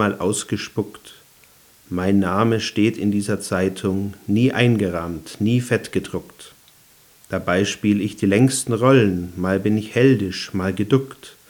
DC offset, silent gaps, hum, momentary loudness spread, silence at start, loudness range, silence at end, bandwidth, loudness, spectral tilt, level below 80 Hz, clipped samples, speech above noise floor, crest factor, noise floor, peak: under 0.1%; none; none; 10 LU; 0 s; 4 LU; 0.2 s; over 20 kHz; -20 LUFS; -6 dB/octave; -58 dBFS; under 0.1%; 32 dB; 20 dB; -52 dBFS; -2 dBFS